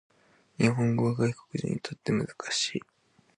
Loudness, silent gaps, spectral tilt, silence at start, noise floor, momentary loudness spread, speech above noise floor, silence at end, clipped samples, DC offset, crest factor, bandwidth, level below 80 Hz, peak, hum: -29 LUFS; none; -5 dB/octave; 0.6 s; -52 dBFS; 8 LU; 24 dB; 0.6 s; under 0.1%; under 0.1%; 20 dB; 11 kHz; -64 dBFS; -10 dBFS; none